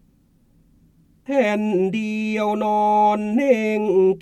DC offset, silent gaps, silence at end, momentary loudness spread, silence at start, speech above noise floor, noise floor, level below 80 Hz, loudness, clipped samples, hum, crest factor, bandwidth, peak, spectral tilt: under 0.1%; none; 0 s; 6 LU; 1.3 s; 39 dB; -58 dBFS; -60 dBFS; -20 LUFS; under 0.1%; none; 16 dB; 12.5 kHz; -4 dBFS; -7 dB/octave